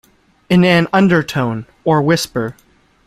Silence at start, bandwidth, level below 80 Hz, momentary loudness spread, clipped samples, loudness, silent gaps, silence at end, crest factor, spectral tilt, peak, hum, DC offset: 0.5 s; 15 kHz; -48 dBFS; 10 LU; under 0.1%; -14 LUFS; none; 0.55 s; 14 dB; -6 dB/octave; 0 dBFS; none; under 0.1%